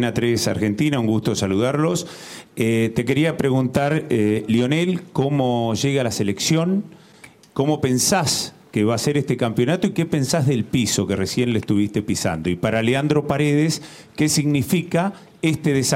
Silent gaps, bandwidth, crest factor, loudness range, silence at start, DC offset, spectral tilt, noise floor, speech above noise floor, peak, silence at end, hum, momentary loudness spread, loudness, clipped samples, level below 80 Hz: none; 16.5 kHz; 16 dB; 1 LU; 0 s; under 0.1%; -5 dB/octave; -47 dBFS; 27 dB; -4 dBFS; 0 s; none; 5 LU; -20 LUFS; under 0.1%; -52 dBFS